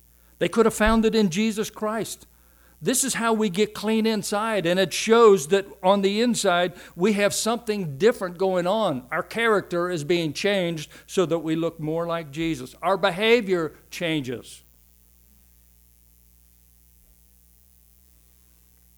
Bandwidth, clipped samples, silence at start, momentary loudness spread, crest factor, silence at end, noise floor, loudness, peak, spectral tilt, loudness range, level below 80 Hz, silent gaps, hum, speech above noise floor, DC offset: over 20 kHz; under 0.1%; 0.4 s; 9 LU; 18 dB; 4.4 s; -57 dBFS; -23 LUFS; -6 dBFS; -4 dB/octave; 5 LU; -46 dBFS; none; 60 Hz at -55 dBFS; 34 dB; under 0.1%